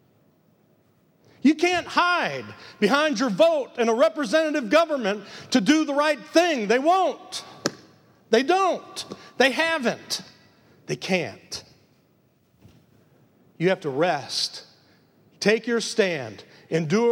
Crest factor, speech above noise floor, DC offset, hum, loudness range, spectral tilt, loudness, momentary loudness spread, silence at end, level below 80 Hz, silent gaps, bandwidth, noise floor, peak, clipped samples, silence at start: 20 dB; 40 dB; under 0.1%; none; 8 LU; -4 dB/octave; -23 LUFS; 13 LU; 0 s; -72 dBFS; none; 16.5 kHz; -63 dBFS; -4 dBFS; under 0.1%; 1.45 s